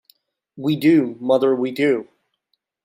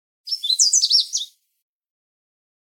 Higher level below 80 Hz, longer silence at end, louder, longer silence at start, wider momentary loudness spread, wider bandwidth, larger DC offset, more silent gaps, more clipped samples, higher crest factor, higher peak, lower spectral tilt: first, -70 dBFS vs under -90 dBFS; second, 0.8 s vs 1.4 s; second, -19 LUFS vs -16 LUFS; first, 0.55 s vs 0.25 s; second, 8 LU vs 14 LU; second, 16 kHz vs 18 kHz; neither; neither; neither; about the same, 16 dB vs 18 dB; about the same, -4 dBFS vs -4 dBFS; first, -7 dB/octave vs 14.5 dB/octave